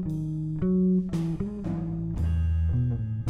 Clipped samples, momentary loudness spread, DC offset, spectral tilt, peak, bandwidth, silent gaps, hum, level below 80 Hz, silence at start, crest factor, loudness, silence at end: under 0.1%; 7 LU; under 0.1%; -10 dB/octave; -16 dBFS; 6.6 kHz; none; none; -38 dBFS; 0 s; 10 dB; -28 LUFS; 0 s